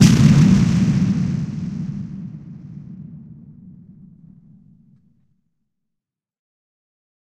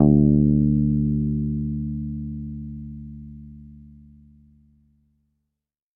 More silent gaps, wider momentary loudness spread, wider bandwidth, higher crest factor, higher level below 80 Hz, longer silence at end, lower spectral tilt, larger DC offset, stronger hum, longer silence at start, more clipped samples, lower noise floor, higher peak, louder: neither; about the same, 25 LU vs 24 LU; first, 13.5 kHz vs 1.2 kHz; about the same, 20 dB vs 20 dB; about the same, -40 dBFS vs -36 dBFS; first, 3.5 s vs 2.1 s; second, -6.5 dB/octave vs -16 dB/octave; neither; neither; about the same, 0 s vs 0 s; neither; about the same, -82 dBFS vs -84 dBFS; about the same, 0 dBFS vs -2 dBFS; first, -17 LUFS vs -22 LUFS